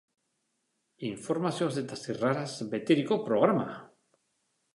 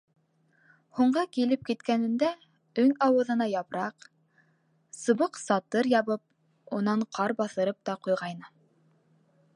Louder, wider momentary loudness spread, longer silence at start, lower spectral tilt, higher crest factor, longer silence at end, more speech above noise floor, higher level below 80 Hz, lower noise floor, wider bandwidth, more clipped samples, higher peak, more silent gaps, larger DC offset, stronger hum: about the same, -30 LUFS vs -28 LUFS; about the same, 13 LU vs 11 LU; about the same, 1 s vs 0.95 s; about the same, -6 dB/octave vs -5.5 dB/octave; about the same, 24 dB vs 20 dB; second, 0.85 s vs 1.1 s; first, 49 dB vs 42 dB; about the same, -76 dBFS vs -78 dBFS; first, -78 dBFS vs -69 dBFS; about the same, 11.5 kHz vs 11 kHz; neither; about the same, -8 dBFS vs -10 dBFS; neither; neither; neither